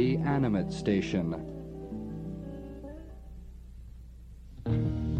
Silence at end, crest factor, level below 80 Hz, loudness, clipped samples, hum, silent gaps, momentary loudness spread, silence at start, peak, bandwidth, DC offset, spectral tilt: 0 s; 18 dB; -46 dBFS; -32 LUFS; under 0.1%; none; none; 22 LU; 0 s; -14 dBFS; 9.2 kHz; under 0.1%; -8 dB/octave